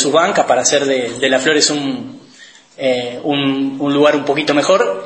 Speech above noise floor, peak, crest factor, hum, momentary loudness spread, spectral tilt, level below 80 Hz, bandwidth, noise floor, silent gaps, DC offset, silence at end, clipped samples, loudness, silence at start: 28 dB; 0 dBFS; 16 dB; none; 7 LU; -3 dB/octave; -62 dBFS; 8.8 kHz; -42 dBFS; none; under 0.1%; 0 s; under 0.1%; -14 LUFS; 0 s